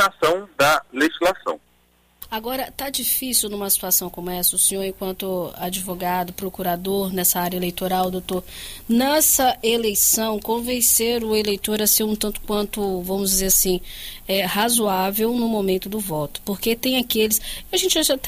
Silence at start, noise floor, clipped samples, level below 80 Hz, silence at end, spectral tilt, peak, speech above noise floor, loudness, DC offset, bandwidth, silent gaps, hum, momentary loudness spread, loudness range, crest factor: 0 s; -59 dBFS; under 0.1%; -44 dBFS; 0 s; -2.5 dB/octave; -4 dBFS; 38 dB; -20 LUFS; under 0.1%; 16 kHz; none; none; 11 LU; 5 LU; 16 dB